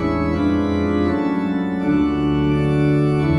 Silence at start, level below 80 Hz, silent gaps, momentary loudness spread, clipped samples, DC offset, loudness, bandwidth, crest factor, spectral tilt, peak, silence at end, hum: 0 s; -38 dBFS; none; 3 LU; under 0.1%; under 0.1%; -19 LUFS; 10 kHz; 10 dB; -9 dB/octave; -6 dBFS; 0 s; none